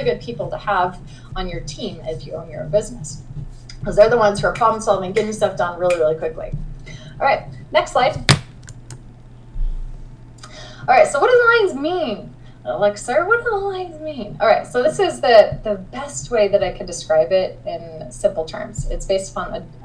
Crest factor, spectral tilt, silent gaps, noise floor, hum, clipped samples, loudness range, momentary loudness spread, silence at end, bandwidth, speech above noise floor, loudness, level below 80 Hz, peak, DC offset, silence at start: 20 dB; -4.5 dB/octave; none; -40 dBFS; none; under 0.1%; 5 LU; 20 LU; 0 s; 10.5 kHz; 21 dB; -18 LUFS; -34 dBFS; 0 dBFS; under 0.1%; 0 s